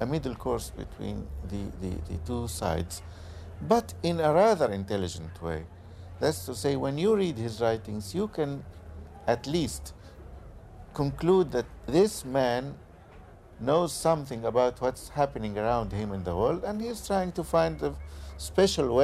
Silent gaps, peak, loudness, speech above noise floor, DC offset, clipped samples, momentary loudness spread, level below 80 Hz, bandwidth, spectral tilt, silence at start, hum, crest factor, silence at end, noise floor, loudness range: none; -10 dBFS; -29 LUFS; 22 dB; under 0.1%; under 0.1%; 18 LU; -46 dBFS; 15.5 kHz; -5.5 dB/octave; 0 s; none; 18 dB; 0 s; -50 dBFS; 5 LU